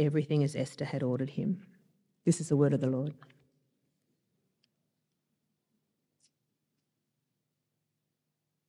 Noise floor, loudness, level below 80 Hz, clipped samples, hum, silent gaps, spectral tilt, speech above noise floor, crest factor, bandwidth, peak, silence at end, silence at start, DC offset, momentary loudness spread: -84 dBFS; -32 LUFS; -82 dBFS; under 0.1%; none; none; -7 dB/octave; 54 dB; 20 dB; 11.5 kHz; -16 dBFS; 5.55 s; 0 s; under 0.1%; 8 LU